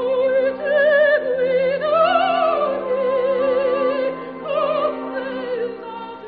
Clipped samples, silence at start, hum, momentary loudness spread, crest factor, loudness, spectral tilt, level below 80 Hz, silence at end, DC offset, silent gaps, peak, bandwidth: under 0.1%; 0 s; none; 10 LU; 14 dB; -19 LUFS; -2 dB/octave; -60 dBFS; 0 s; under 0.1%; none; -6 dBFS; 4.9 kHz